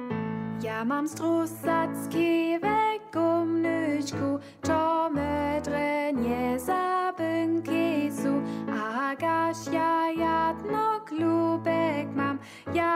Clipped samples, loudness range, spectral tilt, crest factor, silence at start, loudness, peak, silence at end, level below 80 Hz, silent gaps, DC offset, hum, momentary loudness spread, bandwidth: under 0.1%; 1 LU; -6 dB/octave; 14 dB; 0 s; -27 LUFS; -14 dBFS; 0 s; -58 dBFS; none; under 0.1%; none; 5 LU; 15.5 kHz